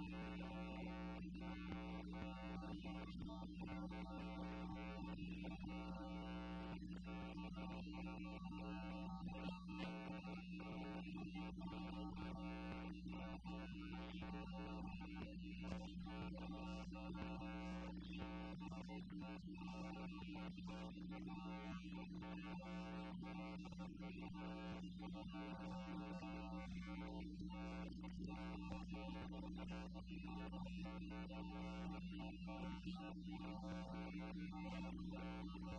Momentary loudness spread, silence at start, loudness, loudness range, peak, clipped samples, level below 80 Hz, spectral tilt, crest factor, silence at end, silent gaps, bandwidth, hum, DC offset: 2 LU; 0 s; -52 LUFS; 1 LU; -32 dBFS; under 0.1%; -60 dBFS; -7 dB/octave; 18 dB; 0 s; none; 9.2 kHz; none; under 0.1%